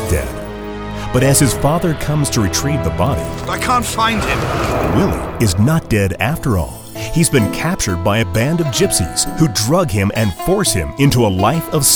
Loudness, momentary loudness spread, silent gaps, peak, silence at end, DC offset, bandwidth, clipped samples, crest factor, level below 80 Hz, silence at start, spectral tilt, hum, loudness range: -15 LUFS; 7 LU; none; 0 dBFS; 0 s; under 0.1%; over 20 kHz; under 0.1%; 14 dB; -30 dBFS; 0 s; -4.5 dB/octave; none; 2 LU